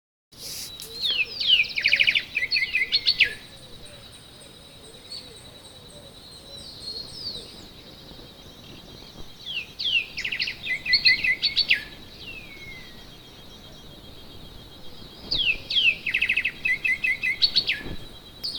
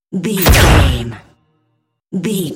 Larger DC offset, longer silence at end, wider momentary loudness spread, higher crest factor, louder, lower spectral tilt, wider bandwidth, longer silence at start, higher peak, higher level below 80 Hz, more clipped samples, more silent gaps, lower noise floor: neither; about the same, 0 s vs 0 s; first, 25 LU vs 16 LU; first, 22 dB vs 14 dB; second, -22 LUFS vs -12 LUFS; second, -1 dB/octave vs -4.5 dB/octave; first, over 20 kHz vs 17.5 kHz; first, 0.35 s vs 0.1 s; second, -6 dBFS vs 0 dBFS; second, -50 dBFS vs -20 dBFS; neither; neither; second, -46 dBFS vs -66 dBFS